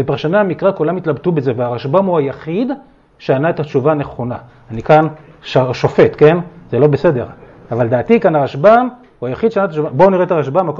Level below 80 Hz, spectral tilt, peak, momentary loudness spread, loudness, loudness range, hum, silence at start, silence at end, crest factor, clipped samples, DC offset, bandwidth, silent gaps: -48 dBFS; -8.5 dB/octave; 0 dBFS; 13 LU; -14 LUFS; 4 LU; none; 0 s; 0 s; 14 dB; under 0.1%; under 0.1%; 7.2 kHz; none